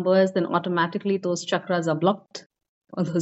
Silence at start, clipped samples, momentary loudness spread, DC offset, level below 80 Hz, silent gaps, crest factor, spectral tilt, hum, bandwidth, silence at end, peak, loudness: 0 s; under 0.1%; 13 LU; under 0.1%; -74 dBFS; 2.46-2.50 s, 2.68-2.81 s; 16 dB; -5 dB/octave; none; 8 kHz; 0 s; -8 dBFS; -24 LUFS